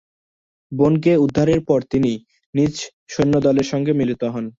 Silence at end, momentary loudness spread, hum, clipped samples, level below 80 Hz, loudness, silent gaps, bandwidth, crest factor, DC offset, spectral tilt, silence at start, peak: 0.1 s; 11 LU; none; under 0.1%; -48 dBFS; -18 LUFS; 2.46-2.53 s, 2.93-3.06 s; 7.8 kHz; 16 dB; under 0.1%; -7 dB/octave; 0.7 s; -4 dBFS